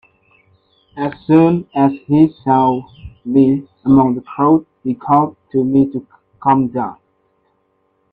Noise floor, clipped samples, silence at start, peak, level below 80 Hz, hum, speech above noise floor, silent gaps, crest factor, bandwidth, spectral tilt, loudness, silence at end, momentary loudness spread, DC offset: -63 dBFS; under 0.1%; 0.95 s; 0 dBFS; -50 dBFS; none; 49 dB; none; 16 dB; 4.6 kHz; -11 dB/octave; -15 LUFS; 1.2 s; 12 LU; under 0.1%